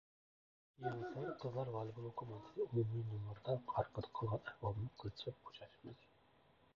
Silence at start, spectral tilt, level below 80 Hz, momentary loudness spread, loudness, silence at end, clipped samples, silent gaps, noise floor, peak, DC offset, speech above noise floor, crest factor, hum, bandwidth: 0.8 s; -6.5 dB/octave; -68 dBFS; 15 LU; -45 LUFS; 0.8 s; under 0.1%; none; -72 dBFS; -24 dBFS; under 0.1%; 27 dB; 22 dB; none; 6.8 kHz